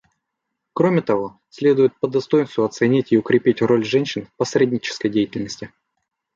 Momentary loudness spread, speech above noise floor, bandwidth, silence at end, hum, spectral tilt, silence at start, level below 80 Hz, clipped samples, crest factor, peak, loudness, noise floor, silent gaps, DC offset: 12 LU; 60 dB; 7.6 kHz; 0.7 s; none; -6 dB/octave; 0.75 s; -62 dBFS; under 0.1%; 16 dB; -4 dBFS; -19 LUFS; -79 dBFS; none; under 0.1%